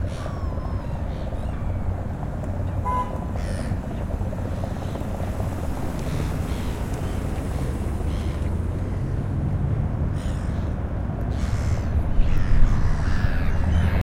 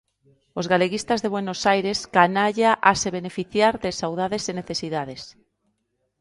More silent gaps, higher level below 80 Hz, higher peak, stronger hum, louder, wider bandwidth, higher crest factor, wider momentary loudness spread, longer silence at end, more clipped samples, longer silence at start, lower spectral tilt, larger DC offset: neither; first, -26 dBFS vs -56 dBFS; second, -4 dBFS vs 0 dBFS; neither; second, -27 LUFS vs -22 LUFS; first, 14 kHz vs 11.5 kHz; about the same, 20 dB vs 22 dB; second, 5 LU vs 11 LU; second, 0 s vs 0.9 s; neither; second, 0 s vs 0.55 s; first, -7.5 dB/octave vs -4 dB/octave; neither